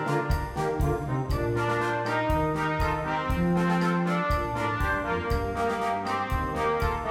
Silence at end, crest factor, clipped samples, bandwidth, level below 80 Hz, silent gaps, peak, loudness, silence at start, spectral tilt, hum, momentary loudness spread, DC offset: 0 s; 14 dB; under 0.1%; 16.5 kHz; -36 dBFS; none; -14 dBFS; -27 LUFS; 0 s; -6.5 dB/octave; none; 3 LU; under 0.1%